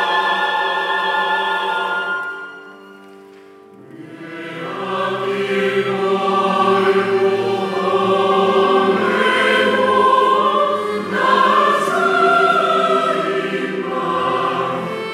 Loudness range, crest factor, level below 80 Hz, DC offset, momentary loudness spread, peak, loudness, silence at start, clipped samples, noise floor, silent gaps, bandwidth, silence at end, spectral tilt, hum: 10 LU; 14 dB; -72 dBFS; under 0.1%; 10 LU; -2 dBFS; -16 LUFS; 0 s; under 0.1%; -42 dBFS; none; 13 kHz; 0 s; -5 dB/octave; none